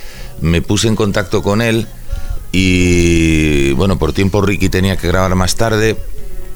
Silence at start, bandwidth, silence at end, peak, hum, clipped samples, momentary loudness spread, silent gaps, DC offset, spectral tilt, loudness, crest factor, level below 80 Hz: 0 s; over 20 kHz; 0 s; 0 dBFS; none; under 0.1%; 15 LU; none; under 0.1%; -5.5 dB/octave; -14 LUFS; 12 dB; -24 dBFS